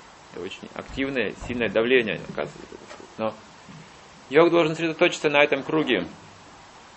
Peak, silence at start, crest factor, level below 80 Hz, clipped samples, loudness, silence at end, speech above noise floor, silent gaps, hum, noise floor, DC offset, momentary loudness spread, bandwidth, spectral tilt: -2 dBFS; 0 s; 24 dB; -54 dBFS; under 0.1%; -23 LUFS; 0.2 s; 24 dB; none; none; -47 dBFS; under 0.1%; 23 LU; 8.4 kHz; -5 dB/octave